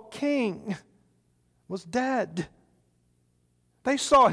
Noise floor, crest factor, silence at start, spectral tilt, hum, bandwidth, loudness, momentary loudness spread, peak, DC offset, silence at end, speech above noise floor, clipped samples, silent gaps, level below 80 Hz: -69 dBFS; 18 dB; 0.1 s; -4.5 dB/octave; 60 Hz at -60 dBFS; 11 kHz; -28 LUFS; 17 LU; -10 dBFS; under 0.1%; 0 s; 44 dB; under 0.1%; none; -60 dBFS